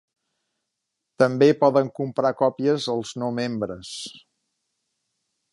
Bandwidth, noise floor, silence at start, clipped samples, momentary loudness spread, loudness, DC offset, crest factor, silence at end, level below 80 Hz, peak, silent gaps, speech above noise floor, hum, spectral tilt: 11.5 kHz; -81 dBFS; 1.2 s; under 0.1%; 16 LU; -22 LUFS; under 0.1%; 20 dB; 1.35 s; -66 dBFS; -4 dBFS; none; 59 dB; none; -6 dB/octave